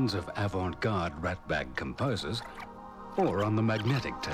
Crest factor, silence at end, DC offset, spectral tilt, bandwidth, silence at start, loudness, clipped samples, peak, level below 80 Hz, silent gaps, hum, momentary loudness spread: 16 dB; 0 s; under 0.1%; -6.5 dB/octave; 13.5 kHz; 0 s; -32 LUFS; under 0.1%; -16 dBFS; -52 dBFS; none; none; 10 LU